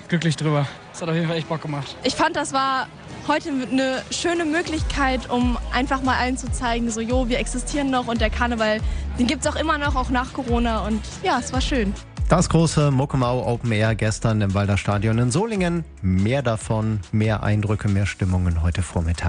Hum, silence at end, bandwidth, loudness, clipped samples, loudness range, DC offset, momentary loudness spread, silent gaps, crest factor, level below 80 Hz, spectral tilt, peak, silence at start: none; 0 s; 10 kHz; -22 LUFS; under 0.1%; 2 LU; under 0.1%; 5 LU; none; 18 dB; -32 dBFS; -5.5 dB/octave; -4 dBFS; 0 s